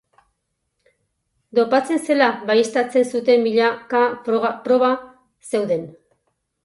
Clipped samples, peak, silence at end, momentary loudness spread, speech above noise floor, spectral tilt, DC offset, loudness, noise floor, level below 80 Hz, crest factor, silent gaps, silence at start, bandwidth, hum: under 0.1%; -2 dBFS; 0.75 s; 7 LU; 56 dB; -4.5 dB/octave; under 0.1%; -19 LUFS; -74 dBFS; -68 dBFS; 18 dB; none; 1.55 s; 11.5 kHz; none